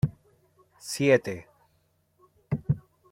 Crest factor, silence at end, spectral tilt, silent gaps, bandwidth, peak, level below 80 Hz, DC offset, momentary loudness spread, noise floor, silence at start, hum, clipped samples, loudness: 24 dB; 0.3 s; -6 dB/octave; none; 16.5 kHz; -6 dBFS; -56 dBFS; under 0.1%; 17 LU; -69 dBFS; 0.05 s; none; under 0.1%; -28 LUFS